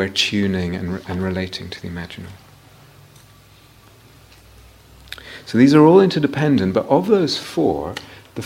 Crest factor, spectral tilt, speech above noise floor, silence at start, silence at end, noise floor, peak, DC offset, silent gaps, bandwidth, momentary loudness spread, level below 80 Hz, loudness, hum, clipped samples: 18 dB; -6 dB/octave; 31 dB; 0 s; 0 s; -48 dBFS; 0 dBFS; under 0.1%; none; 16 kHz; 23 LU; -50 dBFS; -17 LUFS; none; under 0.1%